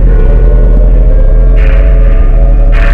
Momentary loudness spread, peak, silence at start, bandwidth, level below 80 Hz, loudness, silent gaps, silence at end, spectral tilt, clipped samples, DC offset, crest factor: 1 LU; 0 dBFS; 0 s; 3.2 kHz; -4 dBFS; -9 LUFS; none; 0 s; -9.5 dB/octave; 5%; under 0.1%; 4 dB